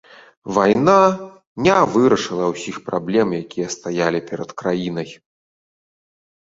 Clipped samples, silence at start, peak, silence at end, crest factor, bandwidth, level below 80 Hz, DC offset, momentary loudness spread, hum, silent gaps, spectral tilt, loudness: under 0.1%; 0.45 s; -2 dBFS; 1.35 s; 18 dB; 8 kHz; -56 dBFS; under 0.1%; 15 LU; none; 1.47-1.56 s; -5.5 dB/octave; -18 LUFS